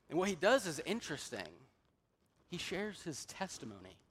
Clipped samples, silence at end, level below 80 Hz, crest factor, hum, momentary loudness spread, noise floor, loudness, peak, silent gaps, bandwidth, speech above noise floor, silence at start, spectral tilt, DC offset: under 0.1%; 0.15 s; -70 dBFS; 22 dB; none; 17 LU; -77 dBFS; -39 LUFS; -18 dBFS; none; 16 kHz; 39 dB; 0.1 s; -3.5 dB/octave; under 0.1%